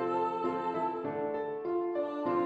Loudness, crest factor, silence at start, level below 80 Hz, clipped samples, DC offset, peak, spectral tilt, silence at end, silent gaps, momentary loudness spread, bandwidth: -33 LUFS; 14 dB; 0 s; -76 dBFS; under 0.1%; under 0.1%; -18 dBFS; -8 dB/octave; 0 s; none; 3 LU; 8 kHz